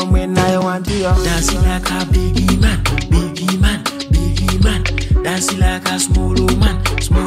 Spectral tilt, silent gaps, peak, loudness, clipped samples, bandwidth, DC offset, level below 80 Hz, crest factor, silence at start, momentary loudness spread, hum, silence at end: -5 dB/octave; none; 0 dBFS; -16 LUFS; under 0.1%; 16 kHz; under 0.1%; -18 dBFS; 14 dB; 0 s; 3 LU; none; 0 s